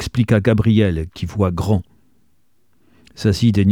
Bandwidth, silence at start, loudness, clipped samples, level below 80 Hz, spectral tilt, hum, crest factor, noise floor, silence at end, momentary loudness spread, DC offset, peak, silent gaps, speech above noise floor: 14 kHz; 0 s; -18 LUFS; under 0.1%; -38 dBFS; -7.5 dB/octave; none; 16 dB; -65 dBFS; 0 s; 7 LU; 0.2%; -2 dBFS; none; 49 dB